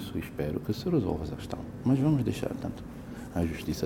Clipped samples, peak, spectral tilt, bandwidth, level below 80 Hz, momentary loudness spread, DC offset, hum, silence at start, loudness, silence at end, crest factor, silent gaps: under 0.1%; -14 dBFS; -7.5 dB/octave; 17 kHz; -48 dBFS; 12 LU; under 0.1%; none; 0 s; -31 LUFS; 0 s; 16 dB; none